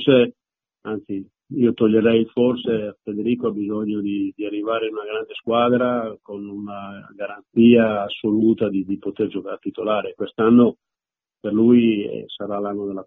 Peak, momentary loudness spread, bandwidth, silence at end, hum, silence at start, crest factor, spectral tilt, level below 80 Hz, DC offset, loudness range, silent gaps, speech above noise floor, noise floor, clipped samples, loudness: -2 dBFS; 17 LU; 3.9 kHz; 0.05 s; none; 0 s; 18 dB; -5.5 dB/octave; -60 dBFS; under 0.1%; 4 LU; none; 70 dB; -90 dBFS; under 0.1%; -20 LUFS